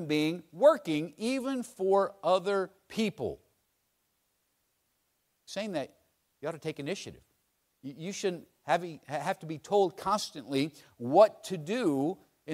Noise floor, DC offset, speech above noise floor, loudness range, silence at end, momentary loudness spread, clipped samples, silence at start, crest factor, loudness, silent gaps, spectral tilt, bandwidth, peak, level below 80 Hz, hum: -77 dBFS; under 0.1%; 47 dB; 11 LU; 0 s; 16 LU; under 0.1%; 0 s; 22 dB; -31 LUFS; none; -5 dB/octave; 15.5 kHz; -8 dBFS; -72 dBFS; none